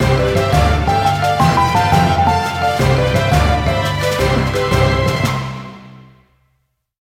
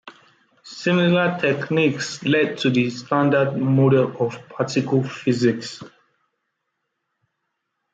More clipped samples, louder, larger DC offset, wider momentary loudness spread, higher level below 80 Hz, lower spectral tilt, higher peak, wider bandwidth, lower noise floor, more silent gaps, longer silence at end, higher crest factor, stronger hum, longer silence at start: neither; first, -15 LUFS vs -20 LUFS; neither; second, 4 LU vs 9 LU; first, -26 dBFS vs -66 dBFS; about the same, -5.5 dB/octave vs -6.5 dB/octave; first, 0 dBFS vs -6 dBFS; first, 16.5 kHz vs 8 kHz; second, -66 dBFS vs -77 dBFS; neither; second, 1 s vs 2.05 s; about the same, 14 dB vs 16 dB; neither; about the same, 0 s vs 0.05 s